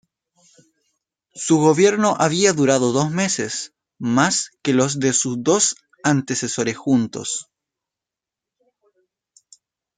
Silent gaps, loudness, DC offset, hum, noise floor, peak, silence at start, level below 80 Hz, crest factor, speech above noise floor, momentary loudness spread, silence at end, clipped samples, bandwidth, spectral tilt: none; -19 LUFS; under 0.1%; none; -87 dBFS; -2 dBFS; 1.35 s; -64 dBFS; 18 dB; 69 dB; 11 LU; 2.55 s; under 0.1%; 9.6 kHz; -4 dB/octave